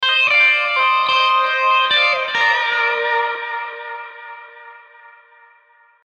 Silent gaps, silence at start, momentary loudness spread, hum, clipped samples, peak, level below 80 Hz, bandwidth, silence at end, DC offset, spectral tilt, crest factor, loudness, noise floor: none; 0 s; 19 LU; none; under 0.1%; -4 dBFS; -70 dBFS; 9 kHz; 1.35 s; under 0.1%; 0.5 dB/octave; 14 dB; -15 LUFS; -53 dBFS